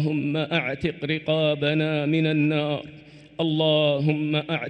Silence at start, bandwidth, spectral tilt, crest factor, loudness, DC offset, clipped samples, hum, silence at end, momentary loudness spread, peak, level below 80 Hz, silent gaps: 0 s; 5.6 kHz; -8 dB/octave; 16 dB; -23 LUFS; under 0.1%; under 0.1%; none; 0 s; 8 LU; -8 dBFS; -58 dBFS; none